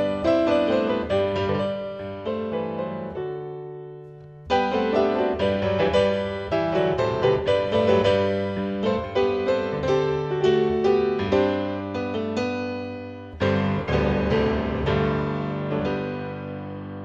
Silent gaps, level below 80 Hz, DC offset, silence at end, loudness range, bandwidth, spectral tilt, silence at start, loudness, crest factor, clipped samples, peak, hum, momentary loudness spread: none; -42 dBFS; under 0.1%; 0 s; 5 LU; 8.2 kHz; -7 dB/octave; 0 s; -24 LUFS; 18 dB; under 0.1%; -6 dBFS; none; 12 LU